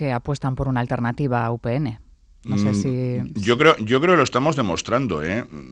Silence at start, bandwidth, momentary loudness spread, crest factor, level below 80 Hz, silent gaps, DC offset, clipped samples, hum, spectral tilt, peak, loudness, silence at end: 0 s; 9.8 kHz; 10 LU; 20 dB; -46 dBFS; none; under 0.1%; under 0.1%; none; -6 dB/octave; 0 dBFS; -21 LUFS; 0 s